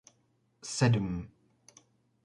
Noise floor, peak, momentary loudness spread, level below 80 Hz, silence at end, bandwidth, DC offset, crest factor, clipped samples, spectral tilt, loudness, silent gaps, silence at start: -72 dBFS; -12 dBFS; 20 LU; -56 dBFS; 1 s; 11.5 kHz; under 0.1%; 22 dB; under 0.1%; -5.5 dB/octave; -31 LUFS; none; 0.65 s